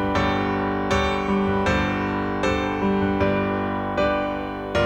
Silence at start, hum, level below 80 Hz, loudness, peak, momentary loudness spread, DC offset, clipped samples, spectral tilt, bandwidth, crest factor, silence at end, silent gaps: 0 s; 50 Hz at -50 dBFS; -38 dBFS; -23 LUFS; -8 dBFS; 4 LU; under 0.1%; under 0.1%; -6.5 dB/octave; 9.4 kHz; 14 dB; 0 s; none